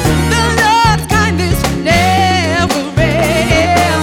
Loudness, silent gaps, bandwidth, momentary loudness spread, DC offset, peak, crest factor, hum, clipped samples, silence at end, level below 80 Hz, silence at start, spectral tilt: -11 LUFS; none; 18 kHz; 4 LU; under 0.1%; 0 dBFS; 12 dB; none; under 0.1%; 0 s; -24 dBFS; 0 s; -4.5 dB/octave